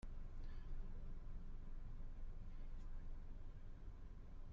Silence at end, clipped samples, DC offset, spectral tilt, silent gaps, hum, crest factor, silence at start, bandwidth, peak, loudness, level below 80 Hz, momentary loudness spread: 0 s; under 0.1%; under 0.1%; -7.5 dB/octave; none; none; 10 dB; 0.05 s; 3.7 kHz; -38 dBFS; -58 LUFS; -50 dBFS; 4 LU